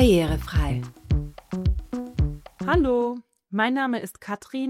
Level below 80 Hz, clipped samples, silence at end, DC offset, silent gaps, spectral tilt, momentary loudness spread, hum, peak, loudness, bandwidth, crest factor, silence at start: -32 dBFS; under 0.1%; 0 s; under 0.1%; none; -7 dB/octave; 11 LU; none; -6 dBFS; -26 LUFS; 15.5 kHz; 18 dB; 0 s